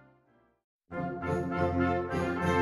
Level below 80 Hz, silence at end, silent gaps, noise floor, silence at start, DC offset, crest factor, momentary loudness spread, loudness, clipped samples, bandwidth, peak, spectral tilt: -52 dBFS; 0 s; none; -67 dBFS; 0.9 s; under 0.1%; 16 dB; 9 LU; -31 LUFS; under 0.1%; 14.5 kHz; -16 dBFS; -7.5 dB/octave